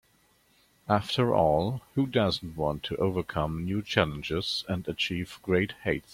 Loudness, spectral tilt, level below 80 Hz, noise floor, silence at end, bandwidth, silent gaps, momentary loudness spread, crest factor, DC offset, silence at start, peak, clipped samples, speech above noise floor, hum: -28 LUFS; -6 dB/octave; -52 dBFS; -66 dBFS; 0 s; 16.5 kHz; none; 7 LU; 24 dB; under 0.1%; 0.9 s; -6 dBFS; under 0.1%; 37 dB; none